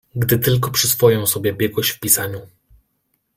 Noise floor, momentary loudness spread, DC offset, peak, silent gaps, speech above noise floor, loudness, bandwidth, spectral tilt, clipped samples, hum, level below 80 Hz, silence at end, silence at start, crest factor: -69 dBFS; 6 LU; under 0.1%; 0 dBFS; none; 51 dB; -17 LUFS; 16.5 kHz; -4 dB/octave; under 0.1%; none; -50 dBFS; 0.9 s; 0.15 s; 20 dB